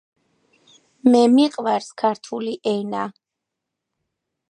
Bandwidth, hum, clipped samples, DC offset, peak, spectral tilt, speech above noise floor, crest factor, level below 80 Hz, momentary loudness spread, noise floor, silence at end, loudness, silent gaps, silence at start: 10 kHz; none; under 0.1%; under 0.1%; -2 dBFS; -5.5 dB/octave; 64 dB; 20 dB; -74 dBFS; 14 LU; -83 dBFS; 1.4 s; -20 LUFS; none; 1.05 s